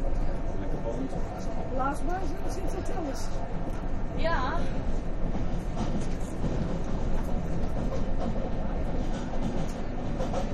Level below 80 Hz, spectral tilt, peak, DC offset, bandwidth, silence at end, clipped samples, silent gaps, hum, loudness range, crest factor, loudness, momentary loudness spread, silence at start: -30 dBFS; -7 dB/octave; -14 dBFS; under 0.1%; 10 kHz; 0 s; under 0.1%; none; none; 1 LU; 12 dB; -33 LUFS; 5 LU; 0 s